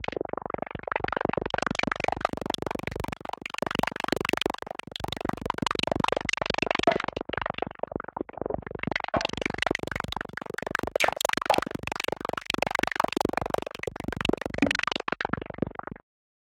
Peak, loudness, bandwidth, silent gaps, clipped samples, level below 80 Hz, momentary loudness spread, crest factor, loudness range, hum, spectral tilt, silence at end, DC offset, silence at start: -6 dBFS; -29 LUFS; 17 kHz; none; under 0.1%; -50 dBFS; 9 LU; 24 dB; 3 LU; none; -4 dB/octave; 0.6 s; under 0.1%; 0 s